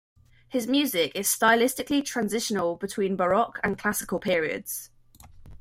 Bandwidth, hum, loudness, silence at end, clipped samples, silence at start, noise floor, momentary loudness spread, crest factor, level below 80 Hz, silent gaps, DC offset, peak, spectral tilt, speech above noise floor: 16.5 kHz; none; -26 LUFS; 0.05 s; under 0.1%; 0.5 s; -51 dBFS; 9 LU; 20 dB; -58 dBFS; none; under 0.1%; -8 dBFS; -3 dB/octave; 25 dB